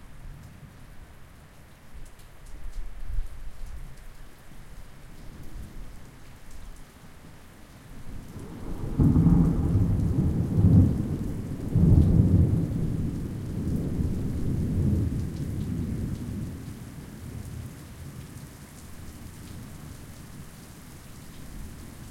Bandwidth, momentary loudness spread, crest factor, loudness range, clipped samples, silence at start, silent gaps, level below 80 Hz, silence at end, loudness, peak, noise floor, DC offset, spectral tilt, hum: 16 kHz; 28 LU; 22 dB; 24 LU; under 0.1%; 0 s; none; -36 dBFS; 0 s; -26 LUFS; -6 dBFS; -49 dBFS; under 0.1%; -8.5 dB/octave; none